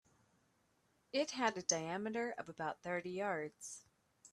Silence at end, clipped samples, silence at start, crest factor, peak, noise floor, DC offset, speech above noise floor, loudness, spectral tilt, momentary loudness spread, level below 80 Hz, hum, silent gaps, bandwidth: 0.05 s; under 0.1%; 1.15 s; 24 dB; -18 dBFS; -77 dBFS; under 0.1%; 37 dB; -40 LUFS; -2.5 dB/octave; 12 LU; -82 dBFS; none; none; 13.5 kHz